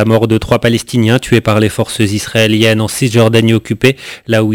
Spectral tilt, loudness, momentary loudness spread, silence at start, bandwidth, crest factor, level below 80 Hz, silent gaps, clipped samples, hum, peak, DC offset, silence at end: -5.5 dB/octave; -11 LUFS; 5 LU; 0 s; 16 kHz; 10 dB; -36 dBFS; none; 0.4%; none; 0 dBFS; 0.4%; 0 s